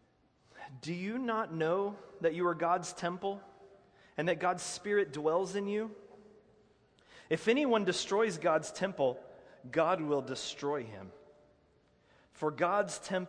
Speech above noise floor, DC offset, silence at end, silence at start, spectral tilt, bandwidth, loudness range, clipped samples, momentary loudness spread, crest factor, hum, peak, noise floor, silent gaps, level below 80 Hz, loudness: 36 dB; under 0.1%; 0 s; 0.55 s; -4.5 dB/octave; 10.5 kHz; 4 LU; under 0.1%; 15 LU; 18 dB; none; -16 dBFS; -69 dBFS; none; -74 dBFS; -33 LUFS